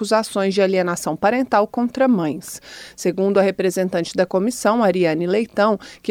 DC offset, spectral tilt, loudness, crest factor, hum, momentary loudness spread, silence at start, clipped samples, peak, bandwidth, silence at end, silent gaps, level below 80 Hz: under 0.1%; -5.5 dB/octave; -19 LUFS; 16 dB; none; 8 LU; 0 s; under 0.1%; -4 dBFS; 17.5 kHz; 0 s; none; -60 dBFS